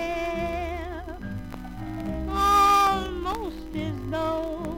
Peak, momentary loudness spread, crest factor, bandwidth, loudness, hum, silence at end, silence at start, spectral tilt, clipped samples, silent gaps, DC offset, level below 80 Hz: -10 dBFS; 17 LU; 16 dB; 17 kHz; -25 LUFS; none; 0 s; 0 s; -5 dB/octave; under 0.1%; none; under 0.1%; -40 dBFS